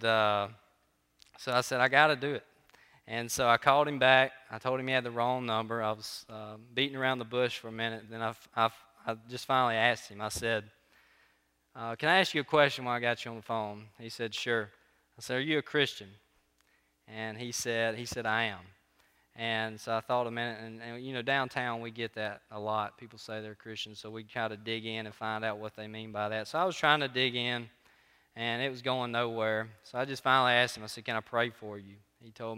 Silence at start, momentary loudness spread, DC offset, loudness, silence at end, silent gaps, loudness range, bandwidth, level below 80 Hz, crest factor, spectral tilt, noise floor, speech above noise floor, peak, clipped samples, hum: 0 s; 16 LU; under 0.1%; -31 LUFS; 0 s; none; 7 LU; 16 kHz; -70 dBFS; 26 dB; -3.5 dB/octave; -72 dBFS; 41 dB; -6 dBFS; under 0.1%; none